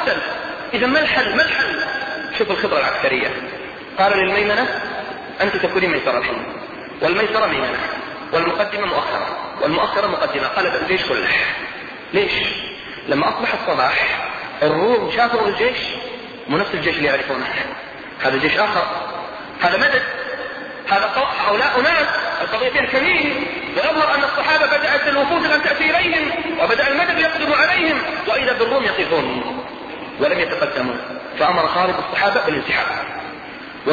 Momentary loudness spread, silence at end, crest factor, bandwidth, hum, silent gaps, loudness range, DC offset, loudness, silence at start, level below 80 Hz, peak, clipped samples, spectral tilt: 12 LU; 0 s; 16 dB; 7.2 kHz; none; none; 4 LU; under 0.1%; -18 LUFS; 0 s; -50 dBFS; -2 dBFS; under 0.1%; -5 dB/octave